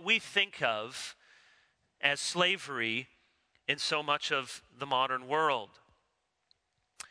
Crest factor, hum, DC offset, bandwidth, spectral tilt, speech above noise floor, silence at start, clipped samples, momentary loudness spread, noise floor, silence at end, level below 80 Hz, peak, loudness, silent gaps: 24 dB; none; under 0.1%; 11 kHz; -2 dB/octave; 47 dB; 0 s; under 0.1%; 14 LU; -79 dBFS; 0.1 s; -80 dBFS; -12 dBFS; -31 LUFS; none